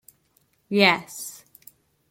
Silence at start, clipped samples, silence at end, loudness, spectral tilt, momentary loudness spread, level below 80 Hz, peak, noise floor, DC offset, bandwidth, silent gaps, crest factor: 0.7 s; under 0.1%; 0.75 s; -20 LUFS; -3.5 dB/octave; 20 LU; -72 dBFS; -2 dBFS; -66 dBFS; under 0.1%; 16.5 kHz; none; 24 dB